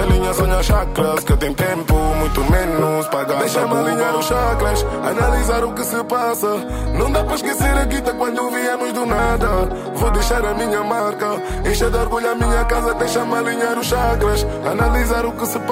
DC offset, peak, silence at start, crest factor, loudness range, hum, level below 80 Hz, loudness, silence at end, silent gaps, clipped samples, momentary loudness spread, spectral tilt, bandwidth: under 0.1%; -4 dBFS; 0 s; 12 dB; 1 LU; none; -22 dBFS; -18 LUFS; 0 s; none; under 0.1%; 3 LU; -5 dB/octave; 16.5 kHz